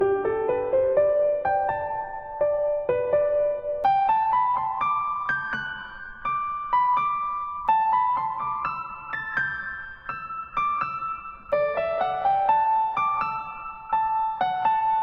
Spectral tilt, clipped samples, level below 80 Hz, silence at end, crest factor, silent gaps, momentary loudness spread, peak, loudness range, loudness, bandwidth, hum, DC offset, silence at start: -6.5 dB/octave; under 0.1%; -54 dBFS; 0 s; 14 dB; none; 11 LU; -10 dBFS; 4 LU; -25 LUFS; 6.4 kHz; none; under 0.1%; 0 s